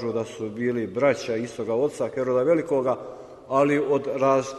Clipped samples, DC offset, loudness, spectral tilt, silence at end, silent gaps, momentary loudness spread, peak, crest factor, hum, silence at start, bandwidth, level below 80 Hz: under 0.1%; under 0.1%; -24 LUFS; -6 dB/octave; 0 s; none; 8 LU; -8 dBFS; 16 dB; none; 0 s; 12 kHz; -64 dBFS